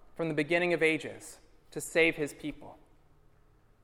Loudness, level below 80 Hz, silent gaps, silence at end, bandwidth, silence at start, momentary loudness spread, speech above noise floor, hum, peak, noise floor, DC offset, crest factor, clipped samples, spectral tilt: -30 LUFS; -60 dBFS; none; 1.1 s; 16.5 kHz; 0.15 s; 20 LU; 32 dB; none; -12 dBFS; -62 dBFS; under 0.1%; 20 dB; under 0.1%; -4.5 dB/octave